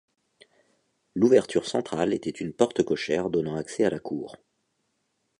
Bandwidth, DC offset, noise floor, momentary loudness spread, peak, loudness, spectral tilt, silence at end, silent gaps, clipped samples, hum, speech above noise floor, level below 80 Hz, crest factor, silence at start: 11 kHz; under 0.1%; -75 dBFS; 13 LU; -6 dBFS; -26 LUFS; -5.5 dB/octave; 1.05 s; none; under 0.1%; none; 50 dB; -62 dBFS; 22 dB; 1.15 s